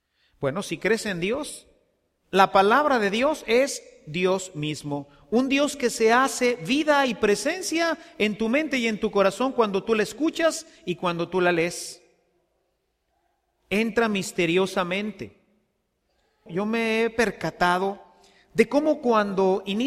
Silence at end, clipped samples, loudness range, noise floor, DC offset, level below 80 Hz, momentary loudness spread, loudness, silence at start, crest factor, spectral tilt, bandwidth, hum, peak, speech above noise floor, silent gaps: 0 s; under 0.1%; 5 LU; -74 dBFS; under 0.1%; -58 dBFS; 11 LU; -24 LUFS; 0.4 s; 22 dB; -4.5 dB/octave; 15.5 kHz; none; -2 dBFS; 50 dB; none